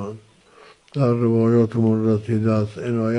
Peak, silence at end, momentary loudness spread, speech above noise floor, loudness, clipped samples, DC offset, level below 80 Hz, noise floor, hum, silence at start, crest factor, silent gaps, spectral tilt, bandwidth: -6 dBFS; 0 s; 7 LU; 31 dB; -20 LUFS; under 0.1%; under 0.1%; -58 dBFS; -50 dBFS; none; 0 s; 14 dB; none; -9.5 dB/octave; 8.8 kHz